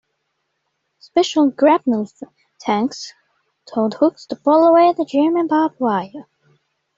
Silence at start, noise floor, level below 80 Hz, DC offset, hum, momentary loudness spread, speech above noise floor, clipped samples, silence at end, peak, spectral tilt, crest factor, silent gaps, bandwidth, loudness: 1.15 s; -72 dBFS; -66 dBFS; under 0.1%; none; 15 LU; 56 dB; under 0.1%; 0.75 s; -2 dBFS; -5.5 dB/octave; 16 dB; none; 7.8 kHz; -17 LUFS